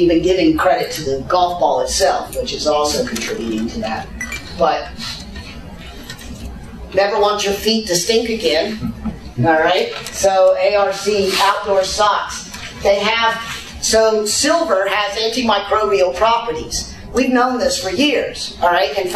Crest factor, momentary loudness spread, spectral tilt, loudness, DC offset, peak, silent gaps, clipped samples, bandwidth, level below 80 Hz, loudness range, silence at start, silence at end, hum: 16 dB; 13 LU; -3 dB/octave; -16 LUFS; under 0.1%; -2 dBFS; none; under 0.1%; 14 kHz; -38 dBFS; 5 LU; 0 s; 0 s; none